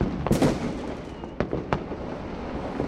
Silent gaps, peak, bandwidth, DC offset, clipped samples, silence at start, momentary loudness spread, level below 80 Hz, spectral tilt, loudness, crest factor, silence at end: none; -4 dBFS; 16 kHz; under 0.1%; under 0.1%; 0 s; 12 LU; -40 dBFS; -6.5 dB/octave; -29 LUFS; 24 dB; 0 s